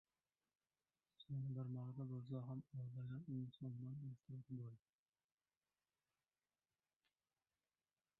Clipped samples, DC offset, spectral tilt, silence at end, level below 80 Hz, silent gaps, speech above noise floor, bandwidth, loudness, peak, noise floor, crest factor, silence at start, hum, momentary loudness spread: under 0.1%; under 0.1%; -12.5 dB/octave; 3.4 s; -84 dBFS; none; over 40 dB; 3.9 kHz; -52 LUFS; -38 dBFS; under -90 dBFS; 16 dB; 1.2 s; none; 7 LU